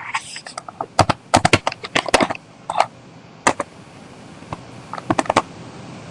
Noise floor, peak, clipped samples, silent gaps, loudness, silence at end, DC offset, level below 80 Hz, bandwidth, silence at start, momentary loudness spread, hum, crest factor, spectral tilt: -42 dBFS; 0 dBFS; under 0.1%; none; -20 LUFS; 0 s; under 0.1%; -48 dBFS; 11.5 kHz; 0 s; 19 LU; none; 22 dB; -3.5 dB/octave